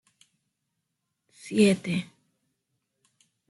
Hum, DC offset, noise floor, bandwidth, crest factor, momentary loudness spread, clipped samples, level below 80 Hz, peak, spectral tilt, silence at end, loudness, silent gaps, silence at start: none; under 0.1%; -81 dBFS; 12 kHz; 22 dB; 24 LU; under 0.1%; -70 dBFS; -8 dBFS; -5.5 dB/octave; 1.45 s; -25 LUFS; none; 1.45 s